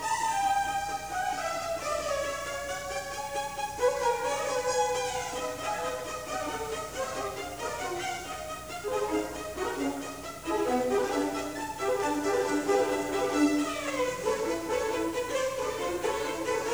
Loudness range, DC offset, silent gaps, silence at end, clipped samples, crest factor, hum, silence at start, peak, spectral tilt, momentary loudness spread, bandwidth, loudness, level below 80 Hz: 5 LU; 0.1%; none; 0 s; under 0.1%; 18 dB; 60 Hz at -55 dBFS; 0 s; -12 dBFS; -3 dB/octave; 8 LU; over 20 kHz; -31 LUFS; -56 dBFS